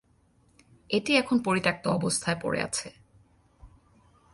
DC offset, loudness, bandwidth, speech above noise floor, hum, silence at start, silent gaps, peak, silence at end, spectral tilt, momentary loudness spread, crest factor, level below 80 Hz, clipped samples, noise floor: under 0.1%; -27 LUFS; 11.5 kHz; 37 dB; none; 0.9 s; none; -8 dBFS; 0.65 s; -4 dB/octave; 8 LU; 22 dB; -60 dBFS; under 0.1%; -64 dBFS